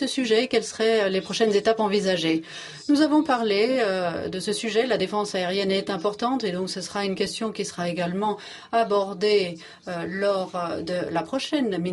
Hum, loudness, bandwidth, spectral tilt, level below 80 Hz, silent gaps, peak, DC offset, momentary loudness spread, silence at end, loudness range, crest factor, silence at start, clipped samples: none; -24 LUFS; 11.5 kHz; -4.5 dB/octave; -64 dBFS; none; -6 dBFS; under 0.1%; 8 LU; 0 s; 4 LU; 18 dB; 0 s; under 0.1%